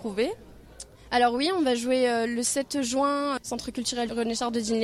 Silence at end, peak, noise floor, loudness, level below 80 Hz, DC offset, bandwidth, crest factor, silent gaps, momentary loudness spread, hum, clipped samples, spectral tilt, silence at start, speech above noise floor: 0 s; -10 dBFS; -47 dBFS; -26 LUFS; -56 dBFS; under 0.1%; 15 kHz; 16 dB; none; 9 LU; none; under 0.1%; -2.5 dB/octave; 0 s; 21 dB